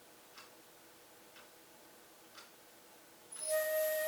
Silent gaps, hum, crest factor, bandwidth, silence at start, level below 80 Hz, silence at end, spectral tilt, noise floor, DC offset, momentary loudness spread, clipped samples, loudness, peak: none; none; 18 dB; over 20 kHz; 0 s; -90 dBFS; 0 s; 0 dB/octave; -60 dBFS; under 0.1%; 24 LU; under 0.1%; -36 LUFS; -24 dBFS